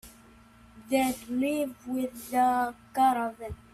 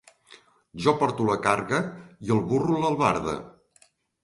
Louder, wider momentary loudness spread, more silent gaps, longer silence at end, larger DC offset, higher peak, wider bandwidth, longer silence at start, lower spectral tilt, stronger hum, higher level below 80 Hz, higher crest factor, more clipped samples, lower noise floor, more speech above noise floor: second, -28 LUFS vs -25 LUFS; second, 8 LU vs 13 LU; neither; second, 0.2 s vs 0.75 s; neither; second, -14 dBFS vs -6 dBFS; first, 15.5 kHz vs 11.5 kHz; second, 0.05 s vs 0.75 s; second, -4.5 dB/octave vs -6 dB/octave; neither; about the same, -58 dBFS vs -56 dBFS; second, 16 dB vs 22 dB; neither; second, -55 dBFS vs -62 dBFS; second, 27 dB vs 37 dB